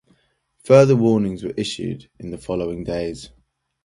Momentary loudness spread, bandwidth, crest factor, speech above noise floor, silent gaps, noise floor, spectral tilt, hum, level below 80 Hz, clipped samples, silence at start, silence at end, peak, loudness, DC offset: 20 LU; 11.5 kHz; 20 dB; 43 dB; none; -62 dBFS; -7 dB/octave; none; -48 dBFS; under 0.1%; 0.65 s; 0.6 s; 0 dBFS; -19 LUFS; under 0.1%